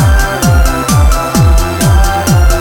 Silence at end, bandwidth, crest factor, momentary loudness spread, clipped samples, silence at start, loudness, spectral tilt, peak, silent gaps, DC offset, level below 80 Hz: 0 s; 20 kHz; 8 dB; 1 LU; under 0.1%; 0 s; -10 LUFS; -5 dB/octave; 0 dBFS; none; under 0.1%; -10 dBFS